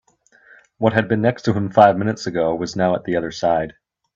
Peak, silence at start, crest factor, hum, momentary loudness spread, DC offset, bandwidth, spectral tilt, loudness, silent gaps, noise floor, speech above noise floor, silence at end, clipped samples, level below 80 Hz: 0 dBFS; 0.8 s; 20 dB; none; 9 LU; under 0.1%; 7.8 kHz; -6.5 dB/octave; -19 LUFS; none; -53 dBFS; 35 dB; 0.45 s; under 0.1%; -54 dBFS